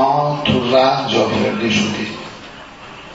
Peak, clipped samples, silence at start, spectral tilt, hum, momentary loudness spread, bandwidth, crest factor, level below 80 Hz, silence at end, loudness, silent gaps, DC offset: -2 dBFS; under 0.1%; 0 s; -5 dB/octave; none; 21 LU; 8 kHz; 16 dB; -48 dBFS; 0 s; -16 LUFS; none; under 0.1%